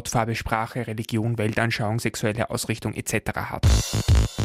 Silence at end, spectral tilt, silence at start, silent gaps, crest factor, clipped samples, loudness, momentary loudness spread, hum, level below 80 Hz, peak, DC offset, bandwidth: 0 s; -5 dB/octave; 0 s; none; 18 dB; under 0.1%; -25 LUFS; 6 LU; none; -30 dBFS; -6 dBFS; under 0.1%; 16 kHz